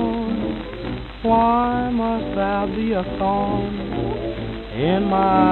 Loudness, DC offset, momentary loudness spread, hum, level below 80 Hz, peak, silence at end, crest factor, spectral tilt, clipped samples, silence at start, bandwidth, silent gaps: -21 LUFS; under 0.1%; 12 LU; none; -36 dBFS; -4 dBFS; 0 s; 16 dB; -9.5 dB/octave; under 0.1%; 0 s; 4.3 kHz; none